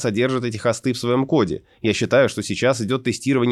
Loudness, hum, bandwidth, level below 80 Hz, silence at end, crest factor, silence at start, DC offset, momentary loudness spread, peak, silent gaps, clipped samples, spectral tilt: -20 LUFS; none; 13 kHz; -54 dBFS; 0 s; 16 dB; 0 s; under 0.1%; 5 LU; -4 dBFS; none; under 0.1%; -5.5 dB/octave